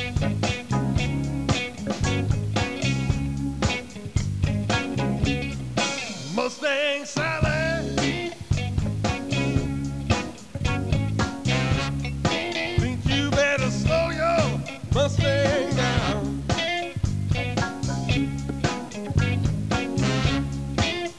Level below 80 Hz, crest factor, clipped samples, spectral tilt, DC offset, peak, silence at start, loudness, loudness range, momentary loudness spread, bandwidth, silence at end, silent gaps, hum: -36 dBFS; 18 dB; under 0.1%; -5.5 dB/octave; 0.4%; -6 dBFS; 0 s; -25 LUFS; 3 LU; 6 LU; 11 kHz; 0 s; none; none